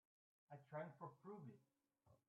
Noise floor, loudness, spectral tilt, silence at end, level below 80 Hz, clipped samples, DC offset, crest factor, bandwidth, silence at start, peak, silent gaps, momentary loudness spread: -79 dBFS; -58 LUFS; -4.5 dB/octave; 0.1 s; under -90 dBFS; under 0.1%; under 0.1%; 22 dB; 3.9 kHz; 0.5 s; -38 dBFS; none; 11 LU